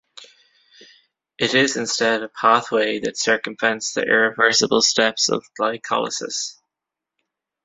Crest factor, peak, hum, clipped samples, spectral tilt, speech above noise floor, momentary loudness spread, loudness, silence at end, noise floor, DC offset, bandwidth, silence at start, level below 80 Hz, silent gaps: 20 dB; -2 dBFS; none; under 0.1%; -2 dB/octave; 66 dB; 9 LU; -19 LUFS; 1.15 s; -86 dBFS; under 0.1%; 8.4 kHz; 0.2 s; -64 dBFS; none